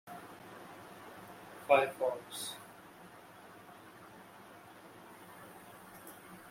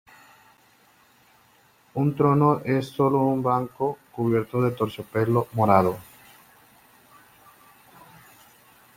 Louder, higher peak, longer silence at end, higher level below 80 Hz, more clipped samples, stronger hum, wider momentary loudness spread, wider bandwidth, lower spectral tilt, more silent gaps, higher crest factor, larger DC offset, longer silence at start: second, -34 LUFS vs -23 LUFS; second, -12 dBFS vs -2 dBFS; second, 0 s vs 2.95 s; second, -80 dBFS vs -62 dBFS; neither; neither; first, 24 LU vs 9 LU; about the same, 16.5 kHz vs 16.5 kHz; second, -3 dB/octave vs -8.5 dB/octave; neither; first, 28 dB vs 22 dB; neither; second, 0.05 s vs 1.95 s